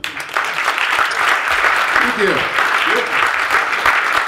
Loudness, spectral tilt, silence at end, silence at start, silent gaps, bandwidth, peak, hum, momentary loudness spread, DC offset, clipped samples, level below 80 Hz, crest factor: -14 LUFS; -1.5 dB/octave; 0 s; 0.05 s; none; 16 kHz; 0 dBFS; none; 4 LU; under 0.1%; under 0.1%; -50 dBFS; 16 dB